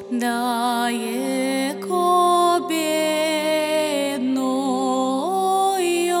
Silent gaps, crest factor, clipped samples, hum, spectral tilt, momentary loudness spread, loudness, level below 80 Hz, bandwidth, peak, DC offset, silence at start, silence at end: none; 12 dB; under 0.1%; none; -3 dB/octave; 6 LU; -21 LUFS; -80 dBFS; 18 kHz; -8 dBFS; under 0.1%; 0 s; 0 s